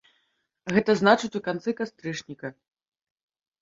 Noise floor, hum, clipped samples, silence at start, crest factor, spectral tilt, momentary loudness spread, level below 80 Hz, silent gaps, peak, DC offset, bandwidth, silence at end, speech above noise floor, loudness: -73 dBFS; none; under 0.1%; 0.65 s; 24 dB; -5.5 dB/octave; 19 LU; -66 dBFS; none; -4 dBFS; under 0.1%; 7.8 kHz; 1.1 s; 48 dB; -25 LUFS